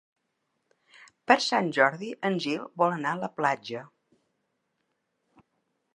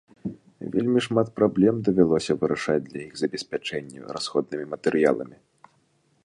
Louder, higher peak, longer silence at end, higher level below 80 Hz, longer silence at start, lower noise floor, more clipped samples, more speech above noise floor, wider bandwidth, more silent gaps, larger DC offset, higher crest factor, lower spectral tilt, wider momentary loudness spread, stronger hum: about the same, -26 LUFS vs -24 LUFS; about the same, -4 dBFS vs -4 dBFS; first, 2.1 s vs 0.95 s; second, -82 dBFS vs -60 dBFS; first, 1.3 s vs 0.25 s; first, -78 dBFS vs -66 dBFS; neither; first, 52 dB vs 42 dB; about the same, 11 kHz vs 11 kHz; neither; neither; first, 28 dB vs 20 dB; second, -4.5 dB/octave vs -6 dB/octave; second, 12 LU vs 16 LU; neither